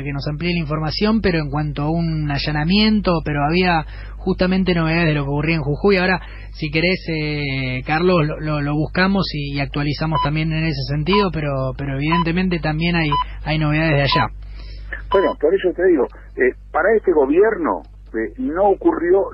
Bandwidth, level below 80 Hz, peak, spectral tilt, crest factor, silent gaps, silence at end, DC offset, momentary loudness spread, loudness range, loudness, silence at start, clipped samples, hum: 5.8 kHz; -32 dBFS; -4 dBFS; -9.5 dB/octave; 14 dB; none; 0 s; under 0.1%; 8 LU; 2 LU; -19 LUFS; 0 s; under 0.1%; none